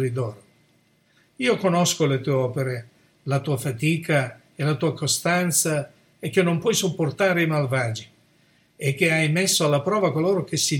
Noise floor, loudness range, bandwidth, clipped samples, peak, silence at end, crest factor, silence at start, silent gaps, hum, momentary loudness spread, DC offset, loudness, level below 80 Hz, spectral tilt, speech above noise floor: -62 dBFS; 2 LU; 17.5 kHz; under 0.1%; -6 dBFS; 0 s; 16 dB; 0 s; none; none; 9 LU; under 0.1%; -22 LUFS; -66 dBFS; -4.5 dB/octave; 40 dB